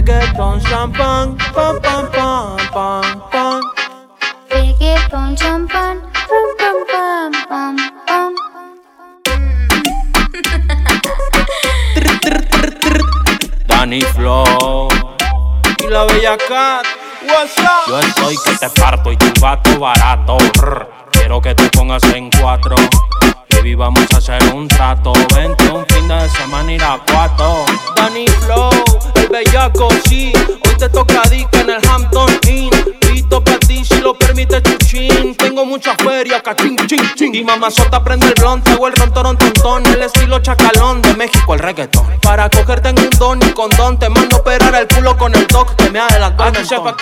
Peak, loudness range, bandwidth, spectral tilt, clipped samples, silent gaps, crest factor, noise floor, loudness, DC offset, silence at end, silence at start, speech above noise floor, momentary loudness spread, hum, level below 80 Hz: 0 dBFS; 6 LU; 17 kHz; -4.5 dB/octave; under 0.1%; none; 10 dB; -40 dBFS; -11 LUFS; under 0.1%; 0 s; 0 s; 31 dB; 6 LU; none; -14 dBFS